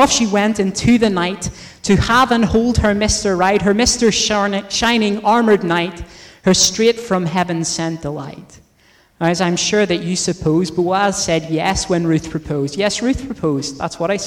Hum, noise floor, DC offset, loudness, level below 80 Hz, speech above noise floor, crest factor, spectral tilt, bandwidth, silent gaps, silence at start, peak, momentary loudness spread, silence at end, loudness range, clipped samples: none; -53 dBFS; under 0.1%; -16 LUFS; -36 dBFS; 37 dB; 14 dB; -4 dB/octave; 19 kHz; none; 0 s; -2 dBFS; 9 LU; 0 s; 4 LU; under 0.1%